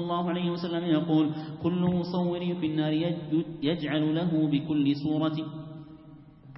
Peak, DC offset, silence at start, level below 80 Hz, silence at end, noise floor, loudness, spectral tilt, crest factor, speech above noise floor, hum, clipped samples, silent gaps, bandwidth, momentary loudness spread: -14 dBFS; under 0.1%; 0 s; -62 dBFS; 0 s; -50 dBFS; -28 LUFS; -11 dB/octave; 14 dB; 23 dB; none; under 0.1%; none; 5.8 kHz; 7 LU